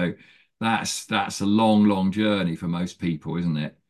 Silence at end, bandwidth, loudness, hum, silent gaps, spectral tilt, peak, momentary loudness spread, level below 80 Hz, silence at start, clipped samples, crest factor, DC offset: 0.2 s; 12.5 kHz; -23 LUFS; none; none; -5.5 dB/octave; -8 dBFS; 10 LU; -52 dBFS; 0 s; under 0.1%; 16 dB; under 0.1%